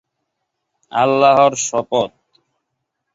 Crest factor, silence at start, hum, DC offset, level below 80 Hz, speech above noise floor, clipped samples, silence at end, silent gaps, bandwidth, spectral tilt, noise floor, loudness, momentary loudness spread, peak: 18 dB; 0.95 s; none; under 0.1%; -60 dBFS; 61 dB; under 0.1%; 1.05 s; none; 8 kHz; -3.5 dB/octave; -75 dBFS; -15 LUFS; 11 LU; -2 dBFS